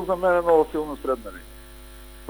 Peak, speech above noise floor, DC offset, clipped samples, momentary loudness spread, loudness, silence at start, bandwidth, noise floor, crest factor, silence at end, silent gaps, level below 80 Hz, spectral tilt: -6 dBFS; 20 dB; under 0.1%; under 0.1%; 25 LU; -22 LUFS; 0 s; over 20 kHz; -43 dBFS; 18 dB; 0 s; none; -44 dBFS; -6 dB/octave